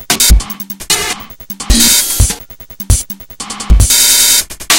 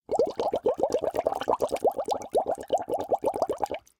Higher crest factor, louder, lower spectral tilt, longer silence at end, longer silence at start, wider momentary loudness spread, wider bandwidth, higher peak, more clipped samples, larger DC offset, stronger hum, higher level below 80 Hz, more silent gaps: second, 12 dB vs 18 dB; first, -9 LUFS vs -28 LUFS; second, -1.5 dB/octave vs -4.5 dB/octave; second, 0 s vs 0.2 s; about the same, 0 s vs 0.1 s; first, 18 LU vs 3 LU; first, over 20 kHz vs 18 kHz; first, 0 dBFS vs -10 dBFS; first, 1% vs under 0.1%; neither; neither; first, -16 dBFS vs -60 dBFS; neither